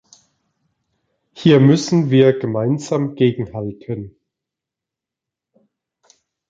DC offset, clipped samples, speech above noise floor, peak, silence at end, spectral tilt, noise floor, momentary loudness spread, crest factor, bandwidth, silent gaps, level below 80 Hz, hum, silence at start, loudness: under 0.1%; under 0.1%; 70 dB; -2 dBFS; 2.4 s; -7 dB/octave; -86 dBFS; 17 LU; 18 dB; 7.8 kHz; none; -56 dBFS; none; 1.35 s; -16 LUFS